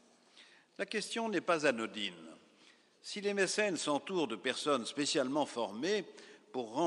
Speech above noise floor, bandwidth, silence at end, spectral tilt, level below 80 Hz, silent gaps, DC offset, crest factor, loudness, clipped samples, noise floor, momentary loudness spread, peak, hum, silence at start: 30 dB; 11.5 kHz; 0 s; -3 dB/octave; -88 dBFS; none; under 0.1%; 20 dB; -35 LUFS; under 0.1%; -65 dBFS; 13 LU; -16 dBFS; none; 0.35 s